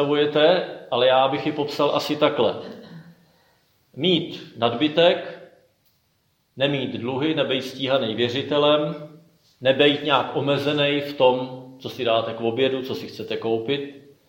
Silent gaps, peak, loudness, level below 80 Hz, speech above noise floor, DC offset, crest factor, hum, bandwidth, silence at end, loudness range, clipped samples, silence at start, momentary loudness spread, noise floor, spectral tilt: none; -2 dBFS; -22 LUFS; -70 dBFS; 46 dB; under 0.1%; 20 dB; none; 17 kHz; 0.3 s; 3 LU; under 0.1%; 0 s; 13 LU; -67 dBFS; -6 dB/octave